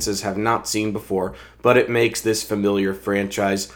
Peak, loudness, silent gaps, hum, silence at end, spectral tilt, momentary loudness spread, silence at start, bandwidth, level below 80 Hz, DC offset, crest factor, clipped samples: 0 dBFS; -21 LUFS; none; none; 0 s; -4 dB/octave; 7 LU; 0 s; over 20 kHz; -50 dBFS; under 0.1%; 20 dB; under 0.1%